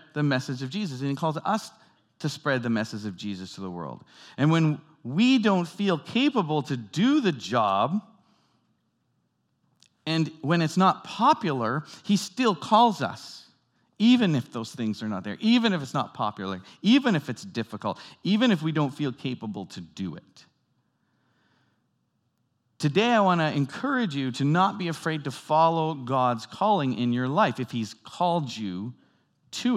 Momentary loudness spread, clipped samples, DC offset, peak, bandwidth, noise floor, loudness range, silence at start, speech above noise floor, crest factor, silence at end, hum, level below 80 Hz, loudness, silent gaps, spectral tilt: 14 LU; under 0.1%; under 0.1%; -6 dBFS; 13 kHz; -73 dBFS; 6 LU; 0.15 s; 48 dB; 20 dB; 0 s; none; -80 dBFS; -26 LUFS; none; -6 dB/octave